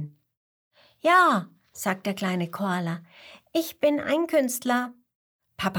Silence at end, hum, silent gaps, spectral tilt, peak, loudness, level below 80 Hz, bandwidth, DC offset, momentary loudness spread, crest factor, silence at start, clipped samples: 0 s; none; 0.37-0.71 s, 5.15-5.39 s; -4.5 dB/octave; -8 dBFS; -25 LUFS; -68 dBFS; over 20 kHz; under 0.1%; 14 LU; 18 dB; 0 s; under 0.1%